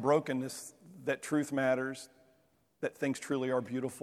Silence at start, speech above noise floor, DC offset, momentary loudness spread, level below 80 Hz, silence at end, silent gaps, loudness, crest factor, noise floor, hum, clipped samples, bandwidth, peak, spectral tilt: 0 s; 38 dB; under 0.1%; 13 LU; -80 dBFS; 0 s; none; -34 LUFS; 20 dB; -71 dBFS; none; under 0.1%; 15 kHz; -14 dBFS; -5.5 dB/octave